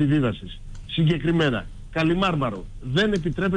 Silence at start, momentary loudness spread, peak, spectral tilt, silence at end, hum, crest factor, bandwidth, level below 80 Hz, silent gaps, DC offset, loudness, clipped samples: 0 s; 14 LU; -10 dBFS; -7 dB/octave; 0 s; none; 12 dB; 9.8 kHz; -38 dBFS; none; under 0.1%; -23 LUFS; under 0.1%